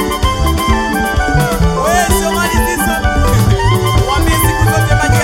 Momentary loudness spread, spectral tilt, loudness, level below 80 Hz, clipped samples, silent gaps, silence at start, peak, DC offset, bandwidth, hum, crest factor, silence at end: 2 LU; -5 dB/octave; -12 LUFS; -18 dBFS; under 0.1%; none; 0 s; 0 dBFS; under 0.1%; 17 kHz; none; 12 dB; 0 s